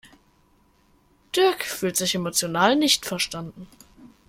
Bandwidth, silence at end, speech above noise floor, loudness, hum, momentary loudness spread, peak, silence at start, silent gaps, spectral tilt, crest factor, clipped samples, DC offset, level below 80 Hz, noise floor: 16.5 kHz; 0.2 s; 38 dB; -22 LUFS; none; 9 LU; -4 dBFS; 0.05 s; none; -2.5 dB/octave; 20 dB; under 0.1%; under 0.1%; -60 dBFS; -61 dBFS